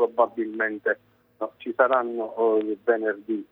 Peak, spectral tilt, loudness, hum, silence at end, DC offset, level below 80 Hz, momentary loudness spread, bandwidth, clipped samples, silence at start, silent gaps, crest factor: -6 dBFS; -8 dB/octave; -25 LUFS; none; 0.1 s; under 0.1%; -78 dBFS; 11 LU; 4 kHz; under 0.1%; 0 s; none; 18 dB